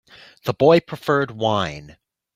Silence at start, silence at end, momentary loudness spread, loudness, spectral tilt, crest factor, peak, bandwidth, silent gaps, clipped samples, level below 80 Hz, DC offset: 0.45 s; 0.5 s; 13 LU; -20 LUFS; -6.5 dB/octave; 20 dB; -2 dBFS; 15.5 kHz; none; under 0.1%; -56 dBFS; under 0.1%